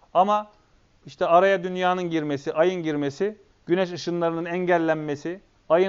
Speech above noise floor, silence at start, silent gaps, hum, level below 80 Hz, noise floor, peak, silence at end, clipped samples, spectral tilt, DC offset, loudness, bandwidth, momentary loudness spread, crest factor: 36 dB; 0.15 s; none; none; -64 dBFS; -59 dBFS; -4 dBFS; 0 s; under 0.1%; -4.5 dB/octave; under 0.1%; -24 LUFS; 7.4 kHz; 11 LU; 20 dB